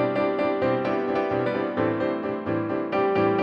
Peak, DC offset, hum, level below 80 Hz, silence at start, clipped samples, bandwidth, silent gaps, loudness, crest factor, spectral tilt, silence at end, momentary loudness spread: -10 dBFS; under 0.1%; none; -60 dBFS; 0 s; under 0.1%; 6.2 kHz; none; -25 LUFS; 14 dB; -8.5 dB/octave; 0 s; 4 LU